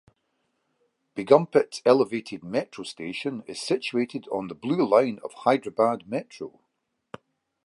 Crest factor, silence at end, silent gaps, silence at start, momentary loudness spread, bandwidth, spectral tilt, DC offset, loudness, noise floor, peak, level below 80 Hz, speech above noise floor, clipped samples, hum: 22 dB; 1.15 s; none; 1.15 s; 15 LU; 11.5 kHz; -5.5 dB/octave; under 0.1%; -25 LUFS; -78 dBFS; -4 dBFS; -72 dBFS; 53 dB; under 0.1%; none